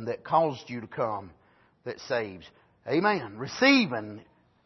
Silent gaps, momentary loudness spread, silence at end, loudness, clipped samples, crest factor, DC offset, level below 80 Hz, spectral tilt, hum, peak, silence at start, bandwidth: none; 22 LU; 0.45 s; -27 LUFS; under 0.1%; 20 dB; under 0.1%; -70 dBFS; -5 dB/octave; none; -8 dBFS; 0 s; 6.2 kHz